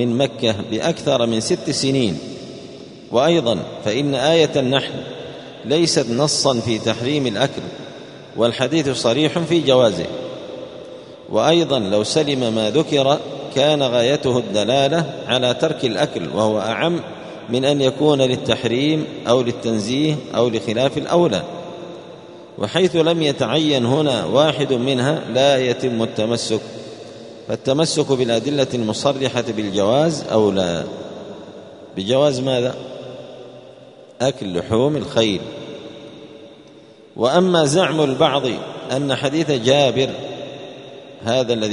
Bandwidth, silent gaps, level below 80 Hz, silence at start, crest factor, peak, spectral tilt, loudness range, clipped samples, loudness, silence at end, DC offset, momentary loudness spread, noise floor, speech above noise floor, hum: 11 kHz; none; -56 dBFS; 0 s; 18 dB; 0 dBFS; -5 dB/octave; 4 LU; under 0.1%; -18 LUFS; 0 s; under 0.1%; 18 LU; -44 dBFS; 26 dB; none